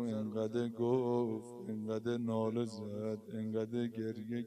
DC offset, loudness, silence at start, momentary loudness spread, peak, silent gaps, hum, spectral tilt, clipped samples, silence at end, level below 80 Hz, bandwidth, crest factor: under 0.1%; -38 LUFS; 0 s; 8 LU; -20 dBFS; none; none; -8 dB/octave; under 0.1%; 0 s; -80 dBFS; 12.5 kHz; 16 dB